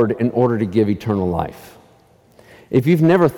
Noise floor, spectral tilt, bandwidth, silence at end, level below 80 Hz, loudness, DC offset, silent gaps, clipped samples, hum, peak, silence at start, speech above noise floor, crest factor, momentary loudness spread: -52 dBFS; -8.5 dB/octave; 18 kHz; 0 s; -48 dBFS; -17 LUFS; under 0.1%; none; under 0.1%; none; -4 dBFS; 0 s; 36 dB; 14 dB; 8 LU